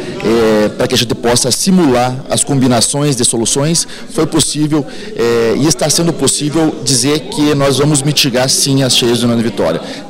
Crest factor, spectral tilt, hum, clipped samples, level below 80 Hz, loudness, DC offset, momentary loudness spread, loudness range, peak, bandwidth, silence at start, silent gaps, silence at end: 12 dB; -4 dB/octave; none; under 0.1%; -38 dBFS; -11 LUFS; under 0.1%; 5 LU; 2 LU; 0 dBFS; 16.5 kHz; 0 s; none; 0 s